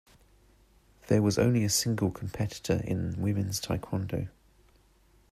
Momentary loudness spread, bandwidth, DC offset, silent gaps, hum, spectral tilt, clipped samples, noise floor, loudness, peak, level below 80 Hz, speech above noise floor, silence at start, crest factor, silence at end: 9 LU; 15 kHz; under 0.1%; none; none; -5 dB/octave; under 0.1%; -63 dBFS; -29 LUFS; -12 dBFS; -54 dBFS; 34 dB; 1.05 s; 20 dB; 1 s